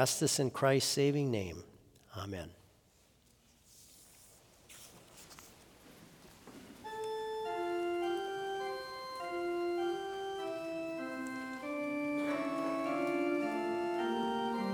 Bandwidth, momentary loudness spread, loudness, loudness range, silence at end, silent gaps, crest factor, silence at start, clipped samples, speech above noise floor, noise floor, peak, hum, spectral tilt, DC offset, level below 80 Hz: over 20 kHz; 24 LU; -36 LUFS; 20 LU; 0 s; none; 22 dB; 0 s; under 0.1%; 35 dB; -67 dBFS; -14 dBFS; none; -4.5 dB/octave; under 0.1%; -72 dBFS